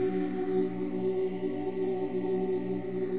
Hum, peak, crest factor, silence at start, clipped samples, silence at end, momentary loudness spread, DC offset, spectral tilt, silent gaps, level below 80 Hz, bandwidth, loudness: none; -18 dBFS; 12 dB; 0 s; under 0.1%; 0 s; 3 LU; 0.7%; -8 dB/octave; none; -66 dBFS; 4 kHz; -32 LUFS